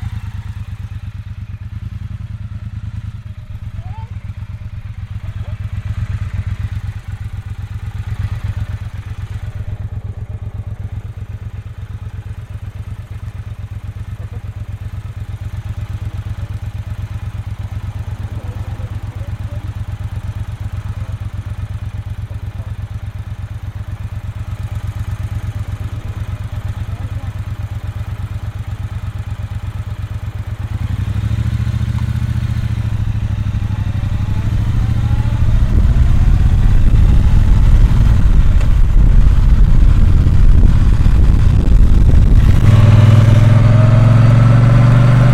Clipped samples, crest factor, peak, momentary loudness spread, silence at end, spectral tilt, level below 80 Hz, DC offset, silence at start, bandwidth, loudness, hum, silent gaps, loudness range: under 0.1%; 14 dB; 0 dBFS; 18 LU; 0 s; -8 dB/octave; -16 dBFS; under 0.1%; 0 s; 9.6 kHz; -17 LUFS; none; none; 16 LU